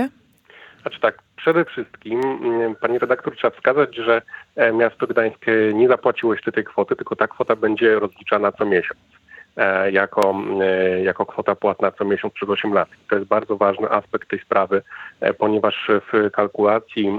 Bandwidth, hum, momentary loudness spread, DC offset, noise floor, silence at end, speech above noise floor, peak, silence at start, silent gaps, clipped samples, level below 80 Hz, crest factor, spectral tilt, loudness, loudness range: 8.2 kHz; none; 6 LU; under 0.1%; -51 dBFS; 0 s; 31 dB; -2 dBFS; 0 s; none; under 0.1%; -66 dBFS; 18 dB; -7 dB/octave; -20 LUFS; 2 LU